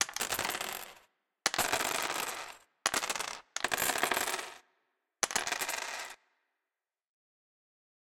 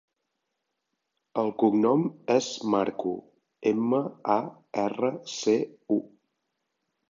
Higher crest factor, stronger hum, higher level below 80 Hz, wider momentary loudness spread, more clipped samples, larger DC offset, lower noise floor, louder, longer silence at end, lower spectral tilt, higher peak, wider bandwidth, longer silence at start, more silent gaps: first, 32 dB vs 20 dB; neither; first, -68 dBFS vs -74 dBFS; first, 12 LU vs 7 LU; neither; neither; first, under -90 dBFS vs -81 dBFS; second, -33 LUFS vs -27 LUFS; first, 2 s vs 1.05 s; second, 0 dB/octave vs -5.5 dB/octave; about the same, -6 dBFS vs -8 dBFS; first, 17 kHz vs 7.6 kHz; second, 0 s vs 1.35 s; neither